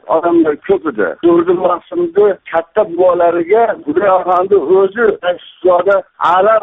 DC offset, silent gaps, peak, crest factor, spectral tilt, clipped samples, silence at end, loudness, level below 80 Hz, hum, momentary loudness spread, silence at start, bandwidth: under 0.1%; none; 0 dBFS; 12 dB; -8 dB/octave; under 0.1%; 0 s; -12 LUFS; -54 dBFS; none; 6 LU; 0.05 s; 4 kHz